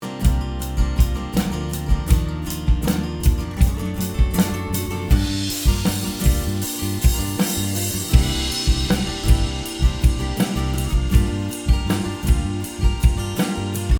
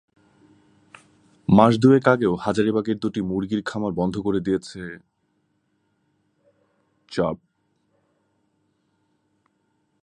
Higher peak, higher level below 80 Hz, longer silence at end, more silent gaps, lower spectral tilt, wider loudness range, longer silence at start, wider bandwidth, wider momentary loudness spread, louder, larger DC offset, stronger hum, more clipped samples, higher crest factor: about the same, 0 dBFS vs 0 dBFS; first, -22 dBFS vs -54 dBFS; second, 0 s vs 2.65 s; neither; second, -5 dB/octave vs -7.5 dB/octave; second, 1 LU vs 14 LU; second, 0 s vs 1.5 s; first, over 20 kHz vs 10.5 kHz; second, 5 LU vs 18 LU; about the same, -21 LUFS vs -21 LUFS; neither; neither; neither; second, 18 dB vs 24 dB